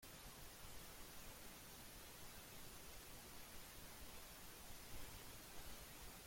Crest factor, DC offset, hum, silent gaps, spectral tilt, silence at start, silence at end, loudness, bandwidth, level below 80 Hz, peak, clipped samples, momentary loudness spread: 16 dB; under 0.1%; none; none; -2.5 dB/octave; 0 s; 0 s; -57 LUFS; 16.5 kHz; -64 dBFS; -40 dBFS; under 0.1%; 1 LU